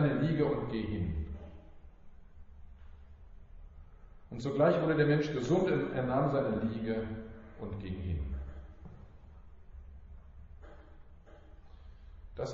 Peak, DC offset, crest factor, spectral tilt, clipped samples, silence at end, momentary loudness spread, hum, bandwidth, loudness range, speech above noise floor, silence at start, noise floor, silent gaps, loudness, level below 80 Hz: -14 dBFS; under 0.1%; 20 dB; -7 dB/octave; under 0.1%; 0 s; 27 LU; none; 7.2 kHz; 18 LU; 23 dB; 0 s; -54 dBFS; none; -33 LUFS; -48 dBFS